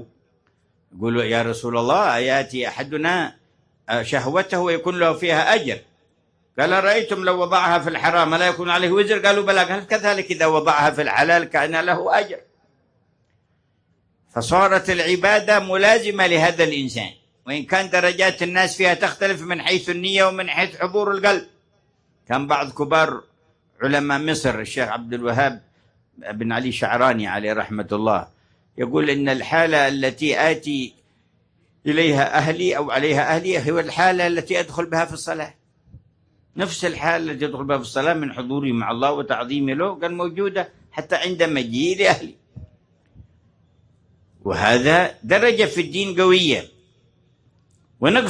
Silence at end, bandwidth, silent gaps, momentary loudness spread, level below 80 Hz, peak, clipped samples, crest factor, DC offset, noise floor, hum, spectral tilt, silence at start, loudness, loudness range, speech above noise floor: 0 s; 10.5 kHz; none; 10 LU; -56 dBFS; 0 dBFS; under 0.1%; 20 dB; under 0.1%; -65 dBFS; none; -4.5 dB/octave; 0 s; -19 LUFS; 6 LU; 46 dB